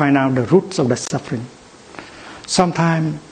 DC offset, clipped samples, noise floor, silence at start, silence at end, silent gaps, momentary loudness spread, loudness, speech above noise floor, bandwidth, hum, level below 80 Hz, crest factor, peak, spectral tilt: under 0.1%; under 0.1%; -38 dBFS; 0 s; 0.05 s; none; 21 LU; -18 LUFS; 21 dB; 9.6 kHz; none; -52 dBFS; 18 dB; 0 dBFS; -5.5 dB/octave